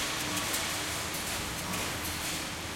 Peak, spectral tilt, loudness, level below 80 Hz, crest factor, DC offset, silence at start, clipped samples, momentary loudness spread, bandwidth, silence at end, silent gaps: -16 dBFS; -2 dB/octave; -32 LUFS; -52 dBFS; 18 dB; under 0.1%; 0 s; under 0.1%; 3 LU; 16.5 kHz; 0 s; none